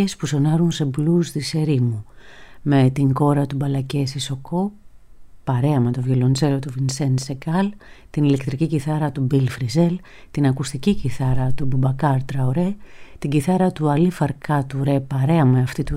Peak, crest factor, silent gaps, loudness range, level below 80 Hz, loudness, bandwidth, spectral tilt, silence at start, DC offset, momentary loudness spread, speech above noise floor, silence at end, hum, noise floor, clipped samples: -6 dBFS; 14 dB; none; 2 LU; -42 dBFS; -20 LUFS; 13 kHz; -7 dB/octave; 0 s; under 0.1%; 7 LU; 21 dB; 0 s; none; -41 dBFS; under 0.1%